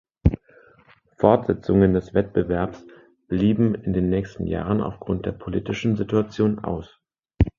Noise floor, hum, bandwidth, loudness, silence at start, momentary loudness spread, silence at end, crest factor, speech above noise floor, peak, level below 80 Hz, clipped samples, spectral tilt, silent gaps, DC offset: -56 dBFS; none; 7.2 kHz; -23 LUFS; 0.25 s; 10 LU; 0.1 s; 22 dB; 34 dB; 0 dBFS; -36 dBFS; under 0.1%; -9 dB/octave; none; under 0.1%